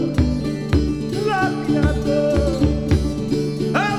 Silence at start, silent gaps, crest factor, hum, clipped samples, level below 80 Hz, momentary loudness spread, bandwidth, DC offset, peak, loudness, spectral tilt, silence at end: 0 s; none; 14 dB; none; under 0.1%; -28 dBFS; 4 LU; 13 kHz; under 0.1%; -4 dBFS; -20 LUFS; -7 dB/octave; 0 s